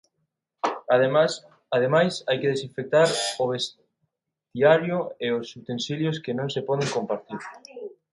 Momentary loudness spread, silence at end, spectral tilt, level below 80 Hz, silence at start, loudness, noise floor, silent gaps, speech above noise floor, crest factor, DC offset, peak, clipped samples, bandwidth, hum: 16 LU; 0.25 s; -4.5 dB/octave; -70 dBFS; 0.65 s; -24 LUFS; -79 dBFS; none; 55 dB; 20 dB; under 0.1%; -6 dBFS; under 0.1%; 11.5 kHz; none